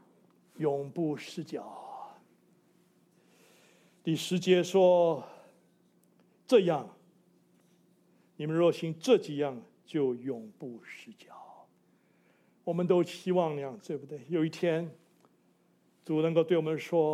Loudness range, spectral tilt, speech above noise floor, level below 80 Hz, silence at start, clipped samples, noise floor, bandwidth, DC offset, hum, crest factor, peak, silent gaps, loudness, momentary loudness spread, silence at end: 10 LU; -6.5 dB/octave; 39 dB; -84 dBFS; 0.6 s; under 0.1%; -68 dBFS; 14.5 kHz; under 0.1%; none; 20 dB; -12 dBFS; none; -30 LUFS; 22 LU; 0 s